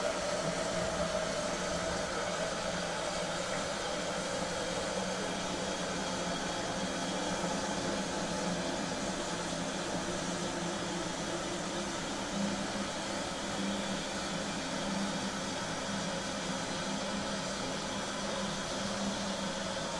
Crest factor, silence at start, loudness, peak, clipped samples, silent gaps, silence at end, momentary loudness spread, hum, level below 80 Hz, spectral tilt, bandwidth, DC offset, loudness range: 16 dB; 0 s; -35 LUFS; -20 dBFS; under 0.1%; none; 0 s; 2 LU; none; -56 dBFS; -3.5 dB/octave; 11.5 kHz; under 0.1%; 1 LU